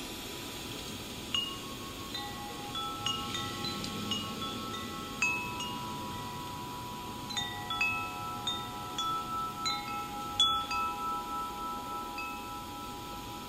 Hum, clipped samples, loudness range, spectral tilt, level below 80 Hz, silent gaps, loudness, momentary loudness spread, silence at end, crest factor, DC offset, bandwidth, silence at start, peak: none; under 0.1%; 4 LU; -2.5 dB/octave; -56 dBFS; none; -35 LUFS; 10 LU; 0 s; 22 dB; under 0.1%; 16 kHz; 0 s; -14 dBFS